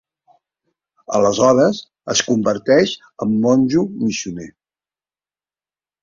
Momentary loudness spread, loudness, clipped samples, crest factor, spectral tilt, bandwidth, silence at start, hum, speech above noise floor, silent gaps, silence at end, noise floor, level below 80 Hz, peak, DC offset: 11 LU; -17 LUFS; under 0.1%; 18 dB; -4.5 dB/octave; 7.6 kHz; 1.1 s; none; over 74 dB; none; 1.5 s; under -90 dBFS; -56 dBFS; -2 dBFS; under 0.1%